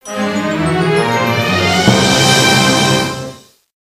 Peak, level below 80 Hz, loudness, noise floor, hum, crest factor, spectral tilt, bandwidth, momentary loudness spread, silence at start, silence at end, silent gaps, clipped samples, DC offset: 0 dBFS; -42 dBFS; -12 LUFS; -33 dBFS; none; 14 dB; -4 dB/octave; 16 kHz; 9 LU; 0.05 s; 0.55 s; none; under 0.1%; under 0.1%